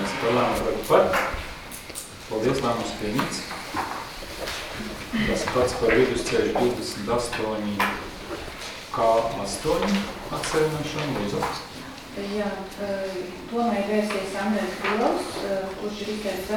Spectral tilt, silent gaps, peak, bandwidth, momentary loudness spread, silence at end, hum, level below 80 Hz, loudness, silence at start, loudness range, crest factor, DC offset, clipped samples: -4.5 dB/octave; none; -4 dBFS; 19.5 kHz; 12 LU; 0 s; none; -44 dBFS; -26 LUFS; 0 s; 4 LU; 22 dB; under 0.1%; under 0.1%